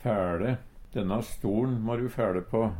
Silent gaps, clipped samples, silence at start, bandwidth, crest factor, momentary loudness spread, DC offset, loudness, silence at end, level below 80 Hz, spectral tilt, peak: none; under 0.1%; 0 s; 16.5 kHz; 16 dB; 5 LU; under 0.1%; -30 LUFS; 0 s; -46 dBFS; -8 dB/octave; -14 dBFS